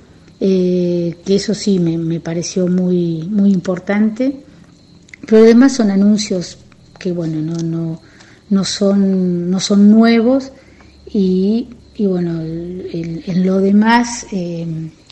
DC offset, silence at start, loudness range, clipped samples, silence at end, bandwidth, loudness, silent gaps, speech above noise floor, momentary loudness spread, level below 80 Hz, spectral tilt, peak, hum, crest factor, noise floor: under 0.1%; 0.4 s; 4 LU; under 0.1%; 0.2 s; 8.8 kHz; -15 LUFS; none; 30 dB; 14 LU; -50 dBFS; -6.5 dB/octave; 0 dBFS; none; 14 dB; -44 dBFS